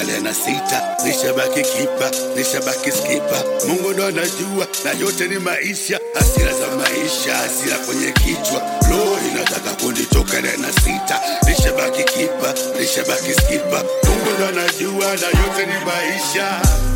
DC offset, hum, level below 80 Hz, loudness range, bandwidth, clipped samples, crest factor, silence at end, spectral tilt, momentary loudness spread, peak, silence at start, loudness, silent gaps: under 0.1%; none; -24 dBFS; 2 LU; 17 kHz; under 0.1%; 16 dB; 0 s; -3.5 dB/octave; 3 LU; 0 dBFS; 0 s; -17 LUFS; none